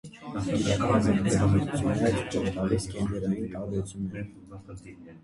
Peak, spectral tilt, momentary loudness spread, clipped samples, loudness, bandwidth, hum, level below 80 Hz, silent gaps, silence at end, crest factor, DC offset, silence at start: -10 dBFS; -6.5 dB/octave; 20 LU; under 0.1%; -28 LUFS; 11.5 kHz; none; -44 dBFS; none; 0.05 s; 18 dB; under 0.1%; 0.05 s